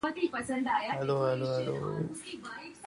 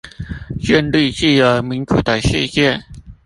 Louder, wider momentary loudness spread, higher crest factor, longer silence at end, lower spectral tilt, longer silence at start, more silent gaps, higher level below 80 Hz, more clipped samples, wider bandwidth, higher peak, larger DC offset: second, -33 LUFS vs -15 LUFS; about the same, 12 LU vs 13 LU; about the same, 16 dB vs 16 dB; second, 0 s vs 0.15 s; about the same, -6 dB/octave vs -5.5 dB/octave; about the same, 0.05 s vs 0.05 s; neither; second, -66 dBFS vs -34 dBFS; neither; about the same, 11.5 kHz vs 11.5 kHz; second, -18 dBFS vs 0 dBFS; neither